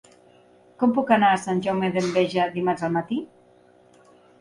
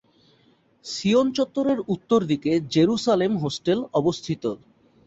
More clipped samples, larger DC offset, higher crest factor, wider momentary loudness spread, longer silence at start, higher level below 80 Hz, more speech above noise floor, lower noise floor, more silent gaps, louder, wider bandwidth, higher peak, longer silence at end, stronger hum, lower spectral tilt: neither; neither; about the same, 18 dB vs 16 dB; about the same, 9 LU vs 8 LU; about the same, 0.8 s vs 0.85 s; second, -66 dBFS vs -60 dBFS; second, 33 dB vs 38 dB; second, -55 dBFS vs -61 dBFS; neither; about the same, -23 LUFS vs -23 LUFS; first, 11.5 kHz vs 8.2 kHz; about the same, -6 dBFS vs -8 dBFS; first, 1.15 s vs 0.5 s; neither; about the same, -6 dB/octave vs -6 dB/octave